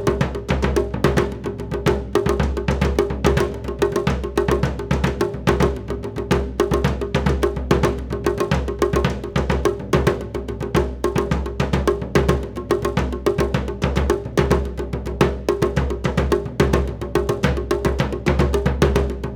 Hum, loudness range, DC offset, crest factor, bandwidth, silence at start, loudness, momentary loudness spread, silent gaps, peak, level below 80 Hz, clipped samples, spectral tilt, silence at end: none; 1 LU; under 0.1%; 20 dB; 17 kHz; 0 s; -21 LUFS; 4 LU; none; 0 dBFS; -26 dBFS; under 0.1%; -6.5 dB/octave; 0 s